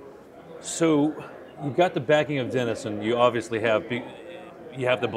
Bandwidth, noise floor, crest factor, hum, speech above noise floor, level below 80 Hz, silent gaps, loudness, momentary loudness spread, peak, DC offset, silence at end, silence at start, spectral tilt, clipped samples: 14 kHz; -45 dBFS; 20 dB; none; 21 dB; -66 dBFS; none; -25 LUFS; 19 LU; -6 dBFS; under 0.1%; 0 s; 0 s; -5 dB/octave; under 0.1%